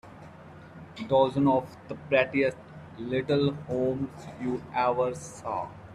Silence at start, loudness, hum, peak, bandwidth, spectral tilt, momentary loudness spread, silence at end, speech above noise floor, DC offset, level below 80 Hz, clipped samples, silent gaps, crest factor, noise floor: 0.05 s; -28 LUFS; none; -10 dBFS; 11.5 kHz; -6.5 dB/octave; 22 LU; 0 s; 20 dB; under 0.1%; -62 dBFS; under 0.1%; none; 18 dB; -48 dBFS